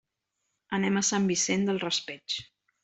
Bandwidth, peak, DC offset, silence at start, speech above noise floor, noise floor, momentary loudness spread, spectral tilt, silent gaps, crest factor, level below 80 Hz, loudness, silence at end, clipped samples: 8.4 kHz; -12 dBFS; under 0.1%; 0.7 s; 53 dB; -81 dBFS; 9 LU; -3.5 dB/octave; none; 18 dB; -68 dBFS; -28 LUFS; 0.4 s; under 0.1%